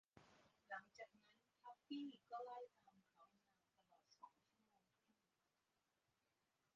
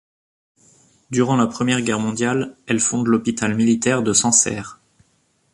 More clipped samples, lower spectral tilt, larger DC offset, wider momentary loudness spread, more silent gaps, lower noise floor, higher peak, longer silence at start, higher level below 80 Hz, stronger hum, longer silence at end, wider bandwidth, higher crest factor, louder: neither; second, -2 dB/octave vs -3.5 dB/octave; neither; first, 14 LU vs 9 LU; neither; first, -90 dBFS vs -63 dBFS; second, -40 dBFS vs -2 dBFS; second, 0.15 s vs 1.1 s; second, under -90 dBFS vs -56 dBFS; neither; first, 2.45 s vs 0.8 s; second, 7.2 kHz vs 11.5 kHz; about the same, 22 dB vs 20 dB; second, -57 LUFS vs -18 LUFS